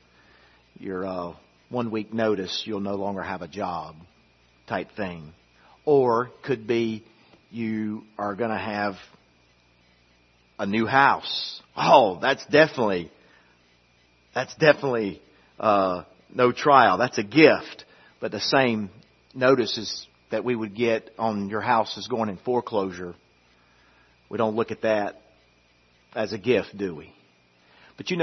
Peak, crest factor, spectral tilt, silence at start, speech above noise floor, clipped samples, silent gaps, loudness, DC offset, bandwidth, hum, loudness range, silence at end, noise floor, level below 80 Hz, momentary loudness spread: 0 dBFS; 24 dB; -5.5 dB/octave; 0.8 s; 37 dB; under 0.1%; none; -24 LUFS; under 0.1%; 6.4 kHz; 60 Hz at -60 dBFS; 9 LU; 0 s; -61 dBFS; -66 dBFS; 17 LU